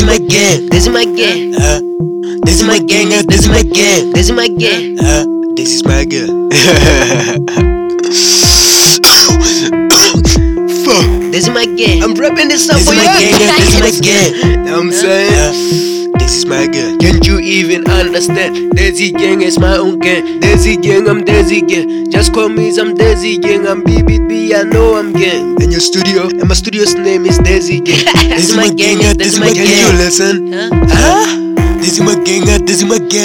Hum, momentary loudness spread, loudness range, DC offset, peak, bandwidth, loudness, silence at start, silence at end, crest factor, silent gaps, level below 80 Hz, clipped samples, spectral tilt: none; 6 LU; 4 LU; 0.2%; 0 dBFS; over 20 kHz; -8 LUFS; 0 s; 0 s; 8 dB; none; -18 dBFS; 0.6%; -3.5 dB/octave